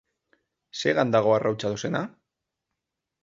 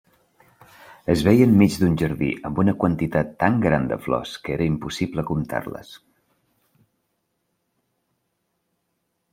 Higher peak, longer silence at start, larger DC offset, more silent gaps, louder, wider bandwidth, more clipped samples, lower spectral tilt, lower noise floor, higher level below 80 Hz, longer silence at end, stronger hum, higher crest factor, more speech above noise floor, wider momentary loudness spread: second, -6 dBFS vs -2 dBFS; second, 0.75 s vs 0.9 s; neither; neither; second, -25 LUFS vs -21 LUFS; second, 7.8 kHz vs 16.5 kHz; neither; second, -5.5 dB/octave vs -7 dB/octave; first, -85 dBFS vs -74 dBFS; second, -66 dBFS vs -48 dBFS; second, 1.15 s vs 3.35 s; neither; about the same, 20 dB vs 20 dB; first, 61 dB vs 54 dB; about the same, 13 LU vs 13 LU